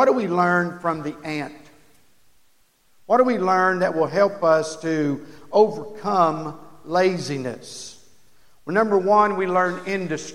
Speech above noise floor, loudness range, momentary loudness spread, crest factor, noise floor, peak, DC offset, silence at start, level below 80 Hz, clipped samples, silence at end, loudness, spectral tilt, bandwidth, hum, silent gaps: 41 dB; 4 LU; 14 LU; 18 dB; -62 dBFS; -4 dBFS; under 0.1%; 0 s; -64 dBFS; under 0.1%; 0 s; -21 LUFS; -5.5 dB/octave; 14 kHz; none; none